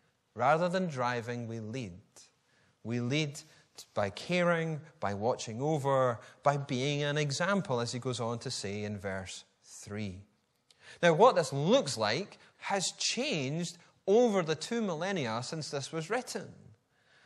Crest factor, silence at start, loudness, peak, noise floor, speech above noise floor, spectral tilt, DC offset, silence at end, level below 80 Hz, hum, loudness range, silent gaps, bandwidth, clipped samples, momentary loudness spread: 22 dB; 0.35 s; -32 LUFS; -10 dBFS; -70 dBFS; 38 dB; -4.5 dB/octave; under 0.1%; 0.7 s; -74 dBFS; none; 6 LU; none; 13 kHz; under 0.1%; 14 LU